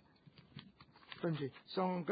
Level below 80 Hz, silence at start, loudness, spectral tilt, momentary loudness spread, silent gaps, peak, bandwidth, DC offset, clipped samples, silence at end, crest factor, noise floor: -78 dBFS; 0.55 s; -41 LUFS; -5.5 dB/octave; 21 LU; none; -24 dBFS; 4.9 kHz; under 0.1%; under 0.1%; 0 s; 18 dB; -64 dBFS